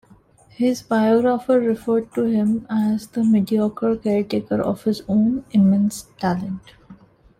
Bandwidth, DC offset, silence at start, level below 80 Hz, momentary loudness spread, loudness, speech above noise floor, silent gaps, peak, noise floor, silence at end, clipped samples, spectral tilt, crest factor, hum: 14.5 kHz; under 0.1%; 0.6 s; -54 dBFS; 7 LU; -20 LUFS; 32 dB; none; -8 dBFS; -51 dBFS; 0.45 s; under 0.1%; -7.5 dB/octave; 12 dB; none